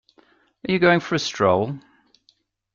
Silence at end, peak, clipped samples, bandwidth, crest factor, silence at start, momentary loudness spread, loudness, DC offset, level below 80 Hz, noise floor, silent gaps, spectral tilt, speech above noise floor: 0.95 s; -2 dBFS; under 0.1%; 7.4 kHz; 20 dB; 0.65 s; 15 LU; -20 LUFS; under 0.1%; -60 dBFS; -64 dBFS; none; -5.5 dB/octave; 44 dB